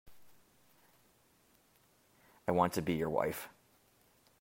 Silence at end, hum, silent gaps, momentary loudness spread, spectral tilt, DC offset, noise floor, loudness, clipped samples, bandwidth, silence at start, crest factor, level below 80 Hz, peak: 0.9 s; none; none; 13 LU; -6 dB/octave; under 0.1%; -70 dBFS; -35 LUFS; under 0.1%; 16 kHz; 0.05 s; 26 dB; -68 dBFS; -14 dBFS